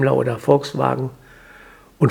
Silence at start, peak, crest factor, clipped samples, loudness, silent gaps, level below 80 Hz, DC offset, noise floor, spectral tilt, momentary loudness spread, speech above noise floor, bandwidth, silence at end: 0 s; 0 dBFS; 20 dB; under 0.1%; -20 LUFS; none; -54 dBFS; under 0.1%; -46 dBFS; -7.5 dB/octave; 8 LU; 27 dB; 15.5 kHz; 0 s